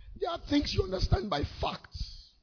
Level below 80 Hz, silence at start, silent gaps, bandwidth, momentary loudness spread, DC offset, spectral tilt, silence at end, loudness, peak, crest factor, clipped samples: -40 dBFS; 0 s; none; 5.4 kHz; 13 LU; under 0.1%; -6 dB/octave; 0.15 s; -32 LUFS; -14 dBFS; 20 dB; under 0.1%